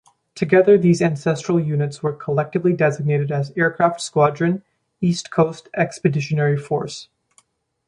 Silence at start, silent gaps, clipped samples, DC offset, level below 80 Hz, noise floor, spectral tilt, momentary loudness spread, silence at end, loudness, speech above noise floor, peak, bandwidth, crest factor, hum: 0.35 s; none; under 0.1%; under 0.1%; -60 dBFS; -60 dBFS; -6.5 dB/octave; 9 LU; 0.85 s; -19 LUFS; 41 dB; -2 dBFS; 11 kHz; 18 dB; none